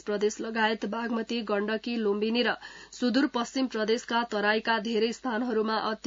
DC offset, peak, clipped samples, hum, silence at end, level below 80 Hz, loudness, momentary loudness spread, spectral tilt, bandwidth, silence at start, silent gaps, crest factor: under 0.1%; -10 dBFS; under 0.1%; none; 0.1 s; -68 dBFS; -28 LUFS; 5 LU; -4 dB/octave; 7.8 kHz; 0.05 s; none; 18 dB